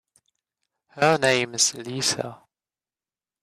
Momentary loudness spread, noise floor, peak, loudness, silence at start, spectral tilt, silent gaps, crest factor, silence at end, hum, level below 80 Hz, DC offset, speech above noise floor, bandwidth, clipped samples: 8 LU; under -90 dBFS; -6 dBFS; -22 LUFS; 0.95 s; -2.5 dB/octave; none; 20 dB; 1.1 s; none; -68 dBFS; under 0.1%; over 67 dB; 14 kHz; under 0.1%